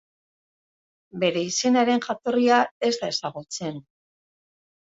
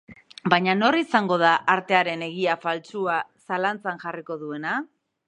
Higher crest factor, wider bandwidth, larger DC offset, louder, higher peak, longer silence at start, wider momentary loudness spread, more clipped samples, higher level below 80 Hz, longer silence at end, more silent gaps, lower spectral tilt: about the same, 20 dB vs 24 dB; second, 7.8 kHz vs 10.5 kHz; neither; about the same, -23 LUFS vs -23 LUFS; second, -6 dBFS vs 0 dBFS; first, 1.15 s vs 0.1 s; about the same, 13 LU vs 13 LU; neither; about the same, -72 dBFS vs -72 dBFS; first, 1.05 s vs 0.45 s; first, 2.71-2.81 s vs none; second, -3.5 dB/octave vs -5.5 dB/octave